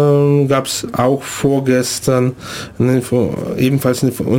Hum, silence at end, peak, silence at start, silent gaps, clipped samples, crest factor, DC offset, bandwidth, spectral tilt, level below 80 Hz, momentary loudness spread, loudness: none; 0 s; -2 dBFS; 0 s; none; under 0.1%; 12 dB; under 0.1%; 17 kHz; -6 dB/octave; -46 dBFS; 7 LU; -15 LUFS